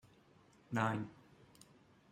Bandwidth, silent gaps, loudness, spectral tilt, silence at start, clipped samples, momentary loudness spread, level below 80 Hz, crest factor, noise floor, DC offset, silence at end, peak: 15 kHz; none; -40 LUFS; -6.5 dB/octave; 0.7 s; under 0.1%; 26 LU; -78 dBFS; 24 dB; -67 dBFS; under 0.1%; 1 s; -20 dBFS